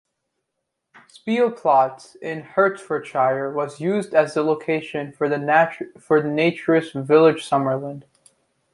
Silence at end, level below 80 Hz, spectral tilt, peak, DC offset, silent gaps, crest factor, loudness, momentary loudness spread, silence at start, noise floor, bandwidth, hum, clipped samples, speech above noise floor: 0.7 s; -70 dBFS; -6.5 dB/octave; -2 dBFS; under 0.1%; none; 18 dB; -20 LUFS; 13 LU; 1.25 s; -79 dBFS; 11.5 kHz; none; under 0.1%; 59 dB